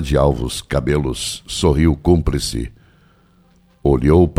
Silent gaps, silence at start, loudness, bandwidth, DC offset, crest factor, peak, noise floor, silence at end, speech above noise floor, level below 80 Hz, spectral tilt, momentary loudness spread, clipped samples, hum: none; 0 s; -18 LUFS; 15.5 kHz; under 0.1%; 16 dB; 0 dBFS; -53 dBFS; 0.05 s; 37 dB; -26 dBFS; -6 dB/octave; 9 LU; under 0.1%; none